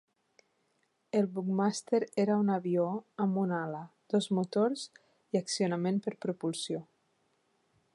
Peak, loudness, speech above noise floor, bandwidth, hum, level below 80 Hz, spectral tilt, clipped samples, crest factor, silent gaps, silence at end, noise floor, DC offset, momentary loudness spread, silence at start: -16 dBFS; -32 LUFS; 45 dB; 11.5 kHz; none; -82 dBFS; -6 dB/octave; under 0.1%; 16 dB; none; 1.1 s; -76 dBFS; under 0.1%; 8 LU; 1.15 s